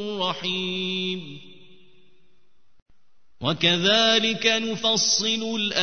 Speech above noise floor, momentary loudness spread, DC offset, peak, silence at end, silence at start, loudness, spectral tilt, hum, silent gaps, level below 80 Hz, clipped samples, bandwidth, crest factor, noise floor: 47 dB; 11 LU; 0.5%; -4 dBFS; 0 s; 0 s; -21 LUFS; -2.5 dB/octave; none; 2.82-2.86 s; -64 dBFS; under 0.1%; 6.6 kHz; 20 dB; -70 dBFS